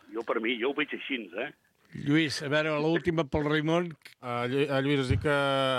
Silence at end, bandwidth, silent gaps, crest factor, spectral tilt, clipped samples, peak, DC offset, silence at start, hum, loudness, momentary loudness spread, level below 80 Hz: 0 s; 13.5 kHz; none; 16 dB; -6 dB/octave; under 0.1%; -12 dBFS; under 0.1%; 0.1 s; none; -29 LUFS; 11 LU; -52 dBFS